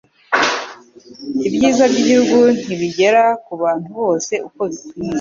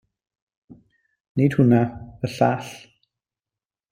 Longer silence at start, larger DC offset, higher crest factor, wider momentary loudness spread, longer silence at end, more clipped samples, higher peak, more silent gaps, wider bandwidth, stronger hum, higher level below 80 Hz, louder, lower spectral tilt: second, 0.3 s vs 1.35 s; neither; second, 14 dB vs 20 dB; second, 12 LU vs 16 LU; second, 0 s vs 1.15 s; neither; about the same, -2 dBFS vs -4 dBFS; neither; second, 7.6 kHz vs 15.5 kHz; neither; about the same, -56 dBFS vs -56 dBFS; first, -16 LUFS vs -21 LUFS; second, -4 dB/octave vs -8 dB/octave